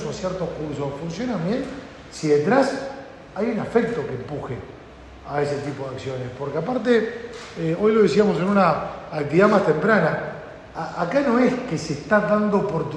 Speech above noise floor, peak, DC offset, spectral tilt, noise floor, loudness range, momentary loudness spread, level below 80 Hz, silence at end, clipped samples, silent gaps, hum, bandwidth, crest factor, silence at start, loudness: 21 dB; -4 dBFS; under 0.1%; -6.5 dB/octave; -42 dBFS; 7 LU; 16 LU; -50 dBFS; 0 s; under 0.1%; none; none; 10 kHz; 18 dB; 0 s; -22 LUFS